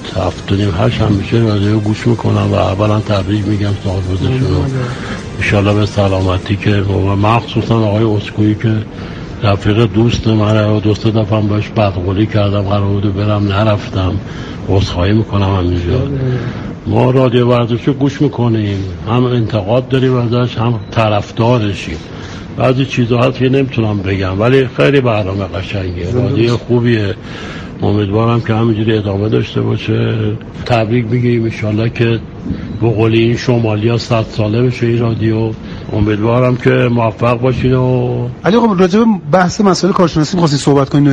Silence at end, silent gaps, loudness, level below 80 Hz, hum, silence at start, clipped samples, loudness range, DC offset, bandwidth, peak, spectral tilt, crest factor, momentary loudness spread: 0 s; none; -13 LUFS; -34 dBFS; none; 0 s; under 0.1%; 3 LU; under 0.1%; 9 kHz; 0 dBFS; -7.5 dB/octave; 12 dB; 8 LU